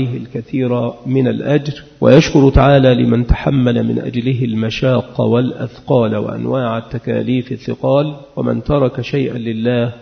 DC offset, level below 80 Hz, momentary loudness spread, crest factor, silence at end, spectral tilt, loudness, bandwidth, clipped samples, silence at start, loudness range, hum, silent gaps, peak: under 0.1%; -30 dBFS; 11 LU; 14 dB; 0.05 s; -7.5 dB/octave; -15 LUFS; 6.6 kHz; under 0.1%; 0 s; 5 LU; none; none; 0 dBFS